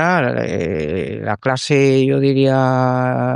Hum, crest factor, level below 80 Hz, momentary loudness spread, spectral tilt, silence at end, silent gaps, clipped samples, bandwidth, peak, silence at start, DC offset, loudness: none; 14 dB; -48 dBFS; 7 LU; -6.5 dB/octave; 0 s; none; under 0.1%; 10.5 kHz; -2 dBFS; 0 s; under 0.1%; -16 LUFS